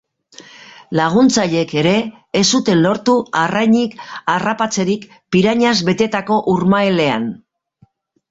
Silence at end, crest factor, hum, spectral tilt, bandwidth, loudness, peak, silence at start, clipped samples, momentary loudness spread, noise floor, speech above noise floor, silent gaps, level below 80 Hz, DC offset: 0.95 s; 16 dB; none; -4.5 dB/octave; 8 kHz; -15 LUFS; 0 dBFS; 0.9 s; under 0.1%; 8 LU; -55 dBFS; 40 dB; none; -54 dBFS; under 0.1%